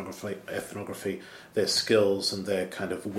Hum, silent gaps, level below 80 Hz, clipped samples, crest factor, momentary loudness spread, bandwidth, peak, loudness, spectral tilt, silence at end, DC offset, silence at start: none; none; -68 dBFS; under 0.1%; 18 dB; 14 LU; 16 kHz; -10 dBFS; -29 LUFS; -3.5 dB/octave; 0 s; under 0.1%; 0 s